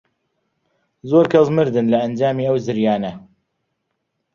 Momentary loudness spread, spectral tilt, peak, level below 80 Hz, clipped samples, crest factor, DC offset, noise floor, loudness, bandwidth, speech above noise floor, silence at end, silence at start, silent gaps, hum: 8 LU; -8 dB/octave; -2 dBFS; -58 dBFS; under 0.1%; 18 dB; under 0.1%; -74 dBFS; -17 LUFS; 7.2 kHz; 57 dB; 1.15 s; 1.05 s; none; none